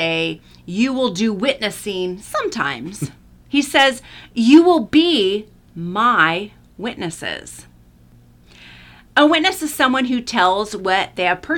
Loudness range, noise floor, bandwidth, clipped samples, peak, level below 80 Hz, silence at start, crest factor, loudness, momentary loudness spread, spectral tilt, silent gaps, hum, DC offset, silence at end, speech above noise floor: 6 LU; -48 dBFS; 18 kHz; under 0.1%; -2 dBFS; -52 dBFS; 0 s; 18 dB; -17 LUFS; 15 LU; -4 dB/octave; none; 60 Hz at -45 dBFS; under 0.1%; 0 s; 31 dB